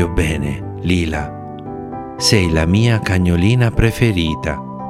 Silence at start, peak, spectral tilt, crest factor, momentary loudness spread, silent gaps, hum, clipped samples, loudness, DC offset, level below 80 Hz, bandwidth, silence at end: 0 s; 0 dBFS; -5.5 dB/octave; 16 dB; 14 LU; none; none; under 0.1%; -16 LUFS; under 0.1%; -30 dBFS; 15 kHz; 0 s